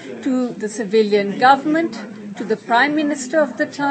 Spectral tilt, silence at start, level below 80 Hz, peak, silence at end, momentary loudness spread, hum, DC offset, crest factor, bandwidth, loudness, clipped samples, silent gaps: -4.5 dB/octave; 0 s; -72 dBFS; 0 dBFS; 0 s; 11 LU; none; under 0.1%; 18 dB; 8.8 kHz; -18 LUFS; under 0.1%; none